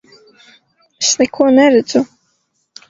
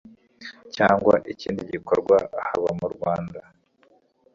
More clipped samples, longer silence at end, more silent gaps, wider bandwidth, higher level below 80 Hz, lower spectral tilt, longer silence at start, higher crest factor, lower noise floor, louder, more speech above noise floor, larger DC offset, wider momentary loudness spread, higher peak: neither; about the same, 0.85 s vs 0.95 s; neither; about the same, 7.8 kHz vs 7.4 kHz; about the same, -58 dBFS vs -56 dBFS; second, -2.5 dB/octave vs -6.5 dB/octave; first, 1 s vs 0.05 s; second, 16 dB vs 22 dB; first, -65 dBFS vs -61 dBFS; first, -12 LUFS vs -23 LUFS; first, 53 dB vs 38 dB; neither; second, 8 LU vs 21 LU; first, 0 dBFS vs -4 dBFS